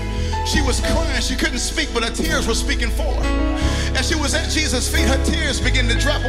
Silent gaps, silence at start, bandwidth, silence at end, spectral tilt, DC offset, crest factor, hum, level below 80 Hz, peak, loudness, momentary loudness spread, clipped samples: none; 0 s; 15.5 kHz; 0 s; -4 dB/octave; under 0.1%; 14 dB; none; -22 dBFS; -4 dBFS; -19 LUFS; 3 LU; under 0.1%